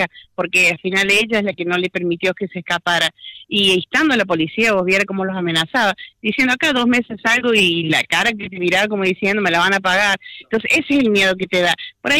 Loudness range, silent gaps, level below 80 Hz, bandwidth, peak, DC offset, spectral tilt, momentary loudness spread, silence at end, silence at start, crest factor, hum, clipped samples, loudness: 1 LU; none; -54 dBFS; 16.5 kHz; -6 dBFS; under 0.1%; -3.5 dB/octave; 7 LU; 0 s; 0 s; 10 dB; none; under 0.1%; -16 LUFS